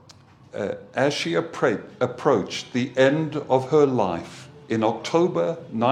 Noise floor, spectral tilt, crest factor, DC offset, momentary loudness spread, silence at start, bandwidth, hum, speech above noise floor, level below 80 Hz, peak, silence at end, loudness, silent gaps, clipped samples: -50 dBFS; -5.5 dB/octave; 20 dB; under 0.1%; 11 LU; 0.55 s; 11 kHz; none; 28 dB; -66 dBFS; -4 dBFS; 0 s; -23 LUFS; none; under 0.1%